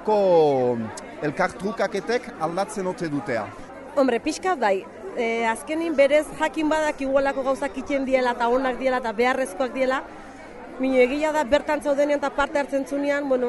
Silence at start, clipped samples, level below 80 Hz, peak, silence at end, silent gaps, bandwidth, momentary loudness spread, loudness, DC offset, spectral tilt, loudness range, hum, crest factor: 0 s; under 0.1%; -50 dBFS; -6 dBFS; 0 s; none; 11.5 kHz; 9 LU; -23 LUFS; under 0.1%; -5 dB/octave; 3 LU; none; 18 dB